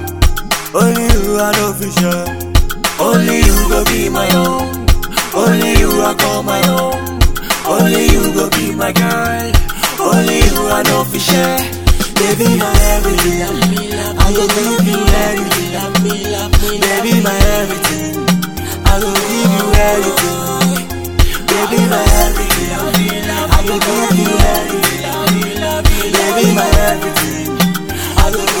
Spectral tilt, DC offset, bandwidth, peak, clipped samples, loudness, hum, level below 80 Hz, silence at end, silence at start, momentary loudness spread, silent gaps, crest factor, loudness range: -4 dB/octave; 1%; 19.5 kHz; 0 dBFS; 0.7%; -13 LUFS; none; -18 dBFS; 0 s; 0 s; 5 LU; none; 12 dB; 1 LU